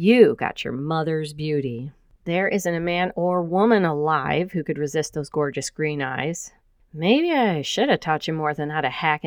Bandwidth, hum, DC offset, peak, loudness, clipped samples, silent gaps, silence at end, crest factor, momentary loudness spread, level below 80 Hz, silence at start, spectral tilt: 19 kHz; none; under 0.1%; -2 dBFS; -22 LUFS; under 0.1%; none; 0 s; 20 dB; 9 LU; -56 dBFS; 0 s; -5.5 dB/octave